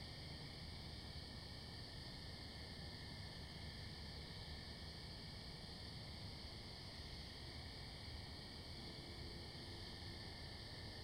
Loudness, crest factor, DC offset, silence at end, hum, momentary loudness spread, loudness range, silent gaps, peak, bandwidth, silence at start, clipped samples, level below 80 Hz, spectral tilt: -52 LUFS; 12 dB; under 0.1%; 0 s; none; 1 LU; 0 LU; none; -40 dBFS; 16 kHz; 0 s; under 0.1%; -60 dBFS; -4.5 dB/octave